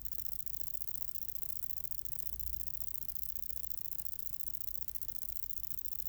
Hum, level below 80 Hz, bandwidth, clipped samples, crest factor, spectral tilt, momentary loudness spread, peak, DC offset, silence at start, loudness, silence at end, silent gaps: 50 Hz at -60 dBFS; -56 dBFS; over 20 kHz; under 0.1%; 22 dB; -2 dB/octave; 1 LU; -18 dBFS; under 0.1%; 0 s; -36 LUFS; 0 s; none